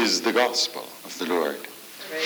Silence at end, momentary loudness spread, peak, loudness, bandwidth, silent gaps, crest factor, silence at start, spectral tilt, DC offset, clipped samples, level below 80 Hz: 0 s; 16 LU; -8 dBFS; -24 LUFS; over 20 kHz; none; 18 dB; 0 s; -1.5 dB/octave; under 0.1%; under 0.1%; -80 dBFS